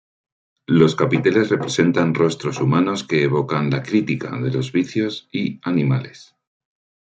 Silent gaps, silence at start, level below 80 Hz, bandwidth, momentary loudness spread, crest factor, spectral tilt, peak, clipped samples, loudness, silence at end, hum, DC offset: none; 0.7 s; -60 dBFS; 9 kHz; 8 LU; 18 dB; -6.5 dB/octave; -2 dBFS; under 0.1%; -19 LUFS; 0.85 s; none; under 0.1%